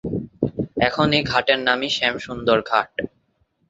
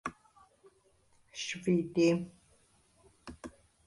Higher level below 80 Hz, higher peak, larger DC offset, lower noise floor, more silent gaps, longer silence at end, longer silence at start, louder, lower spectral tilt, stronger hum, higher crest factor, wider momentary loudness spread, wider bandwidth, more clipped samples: first, -48 dBFS vs -66 dBFS; first, 0 dBFS vs -18 dBFS; neither; about the same, -66 dBFS vs -68 dBFS; neither; first, 0.65 s vs 0.4 s; about the same, 0.05 s vs 0.05 s; first, -20 LUFS vs -32 LUFS; about the same, -5 dB/octave vs -5.5 dB/octave; neither; about the same, 20 dB vs 20 dB; second, 11 LU vs 23 LU; second, 8 kHz vs 11.5 kHz; neither